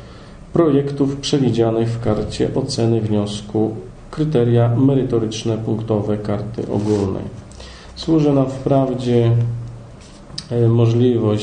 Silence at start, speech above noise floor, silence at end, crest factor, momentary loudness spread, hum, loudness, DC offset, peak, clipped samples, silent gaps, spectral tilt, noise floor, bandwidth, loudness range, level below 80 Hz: 0 s; 22 dB; 0 s; 14 dB; 16 LU; none; -18 LUFS; under 0.1%; -2 dBFS; under 0.1%; none; -7.5 dB/octave; -38 dBFS; 9.8 kHz; 2 LU; -42 dBFS